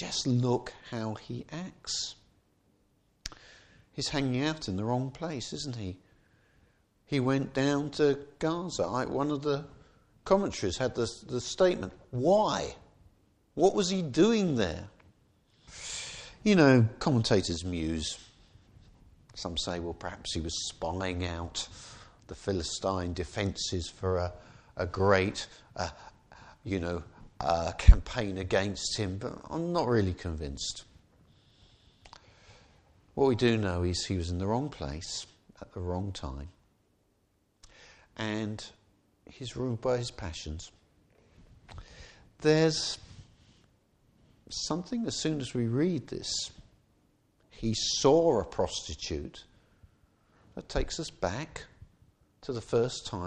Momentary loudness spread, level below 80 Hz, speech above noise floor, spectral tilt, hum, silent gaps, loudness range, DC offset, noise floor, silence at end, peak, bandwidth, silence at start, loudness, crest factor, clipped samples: 18 LU; -40 dBFS; 42 dB; -5 dB/octave; none; none; 10 LU; under 0.1%; -72 dBFS; 0 s; -2 dBFS; 10 kHz; 0 s; -31 LUFS; 28 dB; under 0.1%